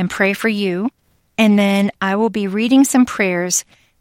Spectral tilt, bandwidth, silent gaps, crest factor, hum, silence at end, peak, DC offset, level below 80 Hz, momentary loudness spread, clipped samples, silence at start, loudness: -4.5 dB/octave; 16.5 kHz; none; 14 dB; none; 0.4 s; -2 dBFS; under 0.1%; -56 dBFS; 7 LU; under 0.1%; 0 s; -16 LUFS